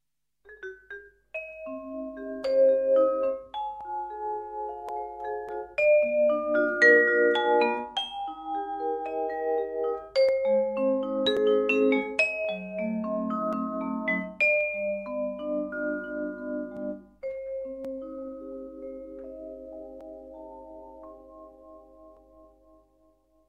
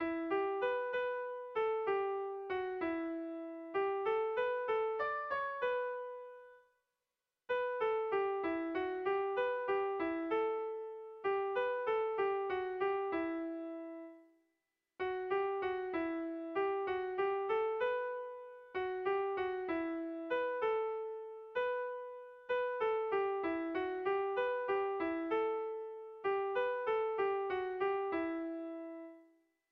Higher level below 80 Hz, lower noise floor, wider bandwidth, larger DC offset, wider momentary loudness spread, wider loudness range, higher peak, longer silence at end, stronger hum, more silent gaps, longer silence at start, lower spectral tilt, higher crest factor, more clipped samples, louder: first, -62 dBFS vs -74 dBFS; second, -65 dBFS vs under -90 dBFS; first, 9 kHz vs 5.4 kHz; neither; first, 21 LU vs 9 LU; first, 18 LU vs 3 LU; first, -8 dBFS vs -24 dBFS; first, 1.35 s vs 0.5 s; neither; neither; first, 0.45 s vs 0 s; first, -5 dB/octave vs -2 dB/octave; first, 20 dB vs 12 dB; neither; first, -27 LUFS vs -37 LUFS